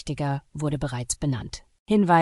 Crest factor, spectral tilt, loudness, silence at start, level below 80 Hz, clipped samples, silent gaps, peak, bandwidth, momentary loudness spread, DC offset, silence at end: 18 dB; -5.5 dB/octave; -26 LUFS; 0 s; -46 dBFS; under 0.1%; 1.79-1.86 s; -6 dBFS; 12 kHz; 11 LU; under 0.1%; 0 s